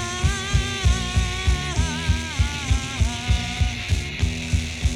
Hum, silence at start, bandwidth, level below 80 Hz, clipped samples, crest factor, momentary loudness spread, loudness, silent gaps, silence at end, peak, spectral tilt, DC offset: none; 0 s; 13 kHz; -26 dBFS; under 0.1%; 16 dB; 3 LU; -23 LUFS; none; 0 s; -6 dBFS; -4 dB/octave; under 0.1%